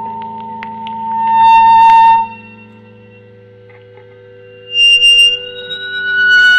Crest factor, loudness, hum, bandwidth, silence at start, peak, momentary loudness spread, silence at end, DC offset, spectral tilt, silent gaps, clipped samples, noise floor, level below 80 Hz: 10 dB; -8 LUFS; none; 14 kHz; 0 s; 0 dBFS; 20 LU; 0 s; under 0.1%; -0.5 dB/octave; none; under 0.1%; -39 dBFS; -52 dBFS